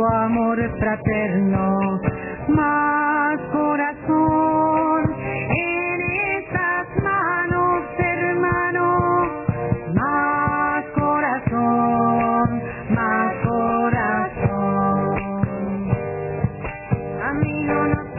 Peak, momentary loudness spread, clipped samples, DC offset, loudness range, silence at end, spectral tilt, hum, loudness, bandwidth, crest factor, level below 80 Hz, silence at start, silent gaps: -4 dBFS; 6 LU; under 0.1%; under 0.1%; 2 LU; 0 s; -12 dB/octave; none; -20 LUFS; 2.9 kHz; 16 dB; -40 dBFS; 0 s; none